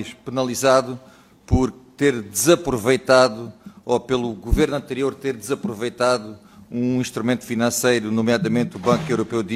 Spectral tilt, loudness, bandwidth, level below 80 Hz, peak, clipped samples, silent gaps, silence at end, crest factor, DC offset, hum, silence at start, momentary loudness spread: -5 dB/octave; -21 LUFS; 15.5 kHz; -36 dBFS; 0 dBFS; under 0.1%; none; 0 s; 20 dB; under 0.1%; none; 0 s; 10 LU